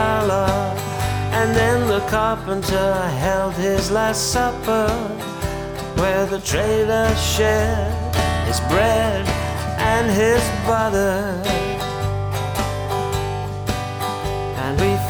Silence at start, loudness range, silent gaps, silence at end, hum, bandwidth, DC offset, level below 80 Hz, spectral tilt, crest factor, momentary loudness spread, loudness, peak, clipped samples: 0 s; 3 LU; none; 0 s; none; over 20 kHz; under 0.1%; -32 dBFS; -5 dB/octave; 16 dB; 8 LU; -20 LUFS; -4 dBFS; under 0.1%